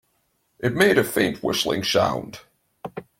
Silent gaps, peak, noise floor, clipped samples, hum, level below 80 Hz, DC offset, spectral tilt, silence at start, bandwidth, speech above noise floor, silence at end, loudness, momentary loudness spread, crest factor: none; -4 dBFS; -69 dBFS; under 0.1%; none; -56 dBFS; under 0.1%; -4 dB/octave; 0.6 s; 16.5 kHz; 48 dB; 0.15 s; -21 LUFS; 19 LU; 20 dB